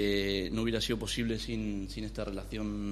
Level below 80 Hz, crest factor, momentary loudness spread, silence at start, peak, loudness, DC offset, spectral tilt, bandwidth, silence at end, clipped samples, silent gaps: -44 dBFS; 18 dB; 7 LU; 0 s; -16 dBFS; -34 LUFS; under 0.1%; -5 dB/octave; 13 kHz; 0 s; under 0.1%; none